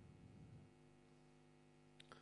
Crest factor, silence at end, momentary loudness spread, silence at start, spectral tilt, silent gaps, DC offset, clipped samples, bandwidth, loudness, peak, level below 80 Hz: 24 dB; 0 s; 7 LU; 0 s; -5.5 dB/octave; none; under 0.1%; under 0.1%; 10 kHz; -66 LUFS; -42 dBFS; -80 dBFS